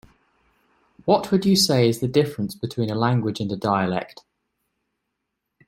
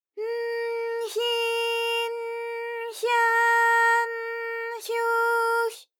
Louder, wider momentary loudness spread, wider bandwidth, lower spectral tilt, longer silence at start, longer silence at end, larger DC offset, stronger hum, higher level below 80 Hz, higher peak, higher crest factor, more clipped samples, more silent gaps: first, -22 LUFS vs -25 LUFS; about the same, 11 LU vs 12 LU; second, 16.5 kHz vs 19 kHz; first, -5.5 dB/octave vs 3.5 dB/octave; first, 1.05 s vs 0.15 s; first, 1.6 s vs 0.15 s; neither; neither; first, -58 dBFS vs under -90 dBFS; first, -4 dBFS vs -12 dBFS; about the same, 18 dB vs 14 dB; neither; neither